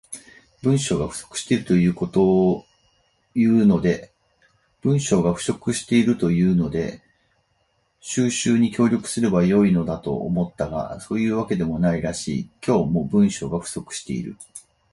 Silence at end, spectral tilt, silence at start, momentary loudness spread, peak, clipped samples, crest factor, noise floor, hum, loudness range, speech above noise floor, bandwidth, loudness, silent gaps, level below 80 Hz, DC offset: 0.35 s; -6 dB/octave; 0.1 s; 12 LU; -6 dBFS; under 0.1%; 16 dB; -67 dBFS; none; 3 LU; 47 dB; 11.5 kHz; -21 LUFS; none; -48 dBFS; under 0.1%